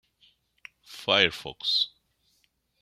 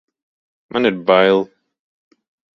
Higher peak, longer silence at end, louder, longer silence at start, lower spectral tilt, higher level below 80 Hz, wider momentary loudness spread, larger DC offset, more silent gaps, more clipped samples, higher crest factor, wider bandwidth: second, -4 dBFS vs 0 dBFS; second, 0.95 s vs 1.1 s; second, -25 LUFS vs -16 LUFS; first, 0.9 s vs 0.75 s; second, -2.5 dB/octave vs -7 dB/octave; about the same, -66 dBFS vs -62 dBFS; about the same, 13 LU vs 12 LU; neither; neither; neither; first, 26 dB vs 20 dB; first, 15.5 kHz vs 6.2 kHz